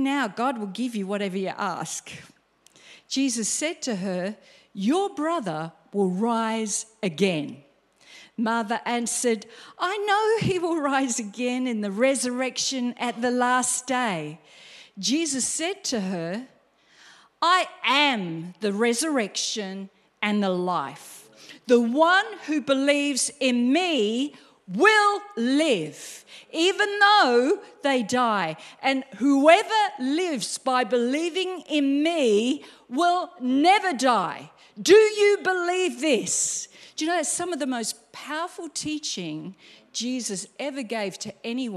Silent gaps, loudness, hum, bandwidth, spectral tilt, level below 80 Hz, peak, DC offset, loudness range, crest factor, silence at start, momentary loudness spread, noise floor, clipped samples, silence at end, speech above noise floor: none; -24 LUFS; none; 14.5 kHz; -3 dB/octave; -70 dBFS; -2 dBFS; under 0.1%; 8 LU; 22 dB; 0 s; 13 LU; -58 dBFS; under 0.1%; 0 s; 34 dB